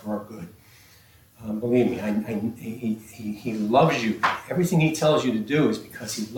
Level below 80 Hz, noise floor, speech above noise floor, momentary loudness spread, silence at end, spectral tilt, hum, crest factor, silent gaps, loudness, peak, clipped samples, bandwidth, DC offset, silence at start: -60 dBFS; -54 dBFS; 30 dB; 13 LU; 0 s; -6 dB/octave; none; 18 dB; none; -24 LUFS; -8 dBFS; under 0.1%; 18.5 kHz; under 0.1%; 0 s